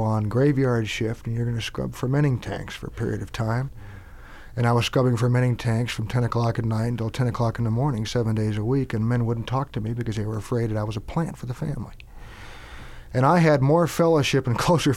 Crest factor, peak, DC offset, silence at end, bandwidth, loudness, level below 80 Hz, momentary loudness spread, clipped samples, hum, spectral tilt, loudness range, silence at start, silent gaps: 16 dB; -6 dBFS; under 0.1%; 0 s; 14.5 kHz; -24 LUFS; -42 dBFS; 15 LU; under 0.1%; none; -6.5 dB/octave; 5 LU; 0 s; none